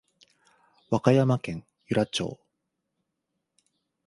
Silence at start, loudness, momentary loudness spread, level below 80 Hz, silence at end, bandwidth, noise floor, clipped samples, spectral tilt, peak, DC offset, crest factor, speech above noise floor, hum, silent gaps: 0.9 s; -26 LUFS; 15 LU; -62 dBFS; 1.7 s; 11.5 kHz; -82 dBFS; under 0.1%; -6.5 dB/octave; -4 dBFS; under 0.1%; 26 dB; 57 dB; none; none